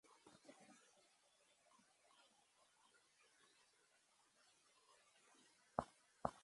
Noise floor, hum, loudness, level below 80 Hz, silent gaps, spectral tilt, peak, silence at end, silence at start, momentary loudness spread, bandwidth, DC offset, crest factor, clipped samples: -78 dBFS; none; -51 LUFS; -78 dBFS; none; -5 dB/octave; -22 dBFS; 0 s; 0.1 s; 18 LU; 11.5 kHz; under 0.1%; 36 dB; under 0.1%